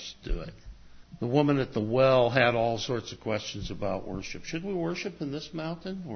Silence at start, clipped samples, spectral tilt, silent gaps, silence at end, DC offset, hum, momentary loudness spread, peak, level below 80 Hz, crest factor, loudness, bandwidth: 0 s; under 0.1%; -6 dB/octave; none; 0 s; under 0.1%; none; 15 LU; -8 dBFS; -46 dBFS; 20 dB; -29 LUFS; 6.6 kHz